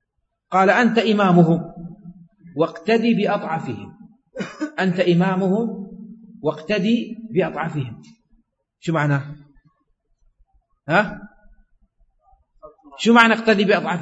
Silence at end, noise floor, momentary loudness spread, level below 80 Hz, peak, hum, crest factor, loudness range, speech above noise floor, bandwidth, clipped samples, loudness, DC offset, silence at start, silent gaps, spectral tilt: 0 s; -74 dBFS; 20 LU; -58 dBFS; 0 dBFS; none; 20 dB; 9 LU; 56 dB; 8 kHz; under 0.1%; -19 LUFS; under 0.1%; 0.5 s; none; -6.5 dB/octave